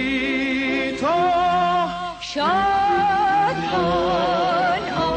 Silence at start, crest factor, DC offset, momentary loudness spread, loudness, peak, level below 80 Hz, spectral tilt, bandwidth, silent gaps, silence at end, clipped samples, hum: 0 s; 10 dB; under 0.1%; 4 LU; -20 LUFS; -10 dBFS; -46 dBFS; -5 dB/octave; 8.8 kHz; none; 0 s; under 0.1%; none